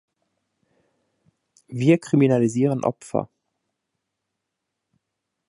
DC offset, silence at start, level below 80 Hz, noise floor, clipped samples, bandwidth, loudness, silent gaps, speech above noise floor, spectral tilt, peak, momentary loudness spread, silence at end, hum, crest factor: under 0.1%; 1.7 s; -68 dBFS; -81 dBFS; under 0.1%; 11.5 kHz; -21 LUFS; none; 61 dB; -7.5 dB/octave; -4 dBFS; 12 LU; 2.25 s; none; 22 dB